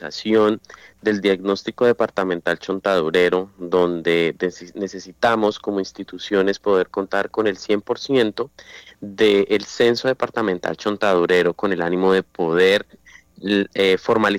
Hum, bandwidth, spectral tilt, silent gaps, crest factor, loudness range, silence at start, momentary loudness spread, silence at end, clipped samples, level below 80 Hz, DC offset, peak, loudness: none; 14.5 kHz; -5 dB/octave; none; 14 dB; 3 LU; 0 s; 9 LU; 0 s; under 0.1%; -58 dBFS; under 0.1%; -4 dBFS; -20 LUFS